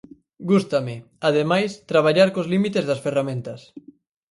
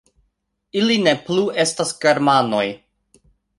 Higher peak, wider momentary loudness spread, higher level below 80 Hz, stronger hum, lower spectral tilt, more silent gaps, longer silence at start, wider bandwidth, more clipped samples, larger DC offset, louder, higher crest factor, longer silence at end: about the same, -2 dBFS vs -2 dBFS; first, 14 LU vs 9 LU; about the same, -64 dBFS vs -62 dBFS; neither; first, -6.5 dB/octave vs -4 dB/octave; neither; second, 0.4 s vs 0.75 s; about the same, 11.5 kHz vs 11.5 kHz; neither; neither; second, -21 LUFS vs -18 LUFS; about the same, 18 dB vs 20 dB; second, 0.55 s vs 0.8 s